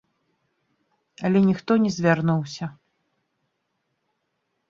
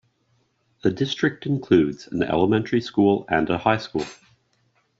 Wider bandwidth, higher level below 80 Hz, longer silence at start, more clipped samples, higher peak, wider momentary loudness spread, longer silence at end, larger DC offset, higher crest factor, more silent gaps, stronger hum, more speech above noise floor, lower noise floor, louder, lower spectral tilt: about the same, 7.4 kHz vs 7.8 kHz; second, -64 dBFS vs -54 dBFS; first, 1.2 s vs 0.85 s; neither; about the same, -4 dBFS vs -4 dBFS; first, 13 LU vs 8 LU; first, 2 s vs 0.85 s; neither; about the same, 22 dB vs 20 dB; neither; neither; first, 55 dB vs 45 dB; first, -76 dBFS vs -67 dBFS; about the same, -22 LUFS vs -22 LUFS; first, -7 dB/octave vs -5 dB/octave